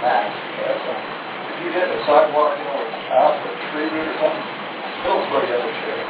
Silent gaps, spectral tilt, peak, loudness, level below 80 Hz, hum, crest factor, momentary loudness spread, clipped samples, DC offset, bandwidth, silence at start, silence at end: none; -8 dB/octave; -2 dBFS; -21 LUFS; -62 dBFS; none; 18 dB; 11 LU; under 0.1%; under 0.1%; 4 kHz; 0 s; 0 s